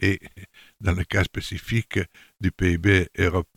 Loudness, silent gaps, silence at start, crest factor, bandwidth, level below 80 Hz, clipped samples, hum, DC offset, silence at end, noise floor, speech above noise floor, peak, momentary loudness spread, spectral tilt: -24 LUFS; none; 0 s; 18 dB; 15.5 kHz; -38 dBFS; under 0.1%; none; under 0.1%; 0.15 s; -46 dBFS; 23 dB; -6 dBFS; 10 LU; -6 dB/octave